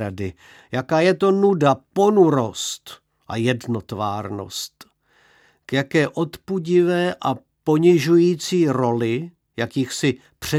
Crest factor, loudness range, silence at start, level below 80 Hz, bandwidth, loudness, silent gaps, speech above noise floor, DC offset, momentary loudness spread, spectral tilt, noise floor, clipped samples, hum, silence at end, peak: 18 dB; 7 LU; 0 s; -58 dBFS; 15 kHz; -20 LUFS; none; 38 dB; under 0.1%; 13 LU; -6 dB/octave; -58 dBFS; under 0.1%; none; 0 s; -2 dBFS